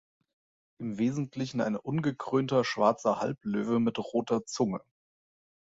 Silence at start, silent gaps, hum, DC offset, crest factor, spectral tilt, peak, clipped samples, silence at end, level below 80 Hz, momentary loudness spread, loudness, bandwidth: 0.8 s; none; none; under 0.1%; 22 dB; -6 dB/octave; -10 dBFS; under 0.1%; 0.85 s; -68 dBFS; 7 LU; -30 LUFS; 8 kHz